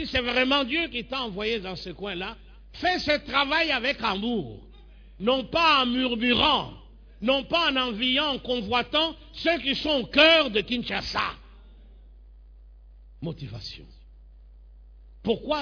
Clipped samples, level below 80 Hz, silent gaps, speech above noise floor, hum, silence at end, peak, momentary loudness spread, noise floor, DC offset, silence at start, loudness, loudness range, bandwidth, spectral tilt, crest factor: under 0.1%; -48 dBFS; none; 23 dB; none; 0 s; -6 dBFS; 16 LU; -49 dBFS; under 0.1%; 0 s; -24 LUFS; 14 LU; 5.4 kHz; -4.5 dB/octave; 20 dB